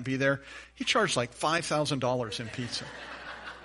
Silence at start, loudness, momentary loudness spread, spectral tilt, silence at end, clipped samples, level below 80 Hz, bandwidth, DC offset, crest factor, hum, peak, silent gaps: 0 s; -29 LUFS; 15 LU; -4 dB/octave; 0 s; under 0.1%; -60 dBFS; 11.5 kHz; under 0.1%; 18 dB; none; -14 dBFS; none